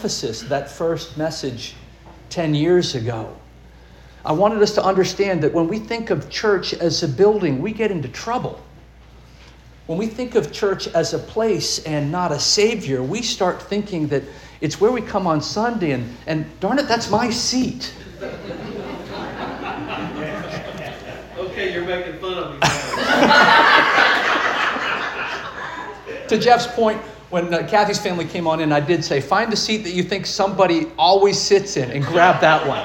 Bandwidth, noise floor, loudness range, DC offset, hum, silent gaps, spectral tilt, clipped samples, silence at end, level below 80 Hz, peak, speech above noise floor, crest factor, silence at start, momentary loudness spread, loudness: 17 kHz; -44 dBFS; 9 LU; under 0.1%; none; none; -4 dB/octave; under 0.1%; 0 s; -48 dBFS; -2 dBFS; 25 dB; 18 dB; 0 s; 15 LU; -19 LUFS